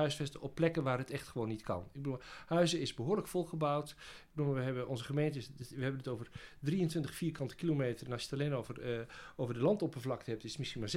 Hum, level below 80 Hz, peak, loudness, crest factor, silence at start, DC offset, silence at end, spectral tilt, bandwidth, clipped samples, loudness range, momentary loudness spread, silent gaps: none; -62 dBFS; -20 dBFS; -38 LUFS; 18 dB; 0 s; under 0.1%; 0 s; -6 dB/octave; 15.5 kHz; under 0.1%; 2 LU; 9 LU; none